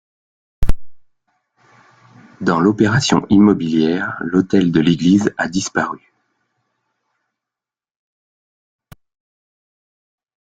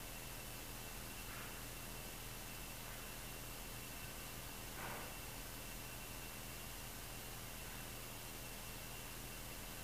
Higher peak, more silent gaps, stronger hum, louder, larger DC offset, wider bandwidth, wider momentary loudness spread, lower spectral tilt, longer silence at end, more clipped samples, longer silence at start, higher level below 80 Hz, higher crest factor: first, 0 dBFS vs -34 dBFS; neither; neither; first, -16 LUFS vs -49 LUFS; second, under 0.1% vs 0.1%; second, 9.2 kHz vs over 20 kHz; first, 13 LU vs 1 LU; first, -5.5 dB/octave vs -2.5 dB/octave; first, 4.5 s vs 0 s; neither; first, 0.6 s vs 0 s; first, -34 dBFS vs -58 dBFS; about the same, 18 dB vs 16 dB